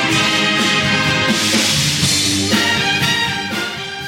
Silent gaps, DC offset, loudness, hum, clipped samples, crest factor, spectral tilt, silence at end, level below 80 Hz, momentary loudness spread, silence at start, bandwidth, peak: none; under 0.1%; -14 LUFS; none; under 0.1%; 14 dB; -2.5 dB/octave; 0 s; -44 dBFS; 6 LU; 0 s; 16.5 kHz; -2 dBFS